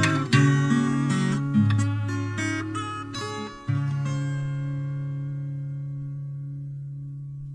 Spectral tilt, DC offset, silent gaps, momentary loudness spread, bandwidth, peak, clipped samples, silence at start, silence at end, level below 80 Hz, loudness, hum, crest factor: -6 dB/octave; under 0.1%; none; 14 LU; 11 kHz; -6 dBFS; under 0.1%; 0 s; 0 s; -56 dBFS; -26 LUFS; none; 18 dB